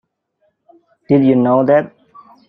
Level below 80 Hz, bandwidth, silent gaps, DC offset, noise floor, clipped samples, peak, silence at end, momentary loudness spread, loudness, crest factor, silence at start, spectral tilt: -60 dBFS; 4.6 kHz; none; under 0.1%; -65 dBFS; under 0.1%; -2 dBFS; 0.6 s; 4 LU; -13 LUFS; 14 dB; 1.1 s; -11 dB/octave